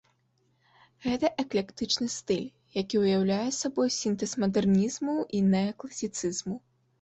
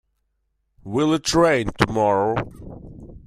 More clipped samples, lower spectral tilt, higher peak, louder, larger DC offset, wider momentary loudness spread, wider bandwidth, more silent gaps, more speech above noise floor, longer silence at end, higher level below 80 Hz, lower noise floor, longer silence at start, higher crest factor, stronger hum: neither; about the same, -5 dB/octave vs -5 dB/octave; second, -12 dBFS vs 0 dBFS; second, -29 LUFS vs -20 LUFS; neither; second, 9 LU vs 22 LU; second, 8.2 kHz vs 15 kHz; neither; second, 43 dB vs 52 dB; first, 0.45 s vs 0.1 s; second, -62 dBFS vs -44 dBFS; about the same, -71 dBFS vs -72 dBFS; first, 1 s vs 0.85 s; about the same, 18 dB vs 22 dB; neither